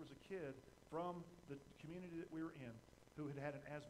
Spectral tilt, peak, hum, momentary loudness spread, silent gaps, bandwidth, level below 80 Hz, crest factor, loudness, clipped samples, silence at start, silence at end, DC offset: -7 dB/octave; -34 dBFS; none; 9 LU; none; 15.5 kHz; -76 dBFS; 18 dB; -53 LUFS; under 0.1%; 0 s; 0 s; under 0.1%